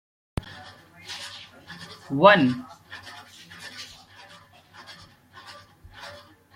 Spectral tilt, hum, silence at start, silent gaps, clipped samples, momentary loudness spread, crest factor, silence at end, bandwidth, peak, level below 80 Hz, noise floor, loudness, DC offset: -5.5 dB/octave; none; 1.1 s; none; under 0.1%; 29 LU; 26 dB; 0.45 s; 15.5 kHz; -2 dBFS; -54 dBFS; -51 dBFS; -22 LUFS; under 0.1%